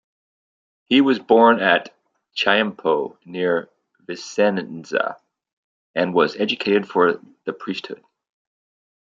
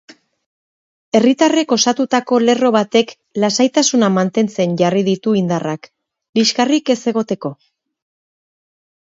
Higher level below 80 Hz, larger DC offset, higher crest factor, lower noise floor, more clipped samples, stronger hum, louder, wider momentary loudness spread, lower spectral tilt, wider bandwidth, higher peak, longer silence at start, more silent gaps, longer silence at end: about the same, -68 dBFS vs -64 dBFS; neither; about the same, 20 dB vs 16 dB; about the same, under -90 dBFS vs under -90 dBFS; neither; neither; second, -20 LUFS vs -15 LUFS; first, 16 LU vs 8 LU; about the same, -5 dB/octave vs -4.5 dB/octave; about the same, 7.6 kHz vs 7.8 kHz; about the same, -2 dBFS vs 0 dBFS; second, 0.9 s vs 1.15 s; first, 5.53-5.94 s vs 6.29-6.33 s; second, 1.15 s vs 1.65 s